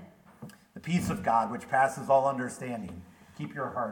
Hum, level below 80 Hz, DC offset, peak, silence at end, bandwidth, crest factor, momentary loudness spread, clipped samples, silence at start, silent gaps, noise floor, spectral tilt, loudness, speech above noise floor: none; -60 dBFS; under 0.1%; -12 dBFS; 0 s; 19 kHz; 18 dB; 23 LU; under 0.1%; 0 s; none; -50 dBFS; -6 dB/octave; -29 LUFS; 21 dB